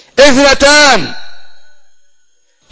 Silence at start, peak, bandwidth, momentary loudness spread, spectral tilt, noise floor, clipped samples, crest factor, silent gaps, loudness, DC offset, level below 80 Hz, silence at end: 0.15 s; 0 dBFS; 8 kHz; 8 LU; -2 dB/octave; -54 dBFS; 2%; 10 dB; none; -6 LUFS; under 0.1%; -34 dBFS; 0.65 s